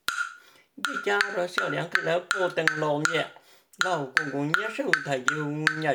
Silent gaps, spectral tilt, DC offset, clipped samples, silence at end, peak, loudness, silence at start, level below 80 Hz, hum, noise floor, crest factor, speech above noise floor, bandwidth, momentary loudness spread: none; -3.5 dB/octave; under 0.1%; under 0.1%; 0 s; -2 dBFS; -27 LUFS; 0.1 s; -74 dBFS; none; -51 dBFS; 26 dB; 24 dB; over 20 kHz; 5 LU